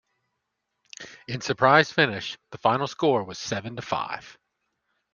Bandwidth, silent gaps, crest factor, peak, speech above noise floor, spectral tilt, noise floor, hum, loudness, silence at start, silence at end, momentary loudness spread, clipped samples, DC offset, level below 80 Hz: 10 kHz; none; 24 dB; -2 dBFS; 55 dB; -4.5 dB/octave; -80 dBFS; none; -24 LUFS; 1 s; 0.8 s; 18 LU; under 0.1%; under 0.1%; -64 dBFS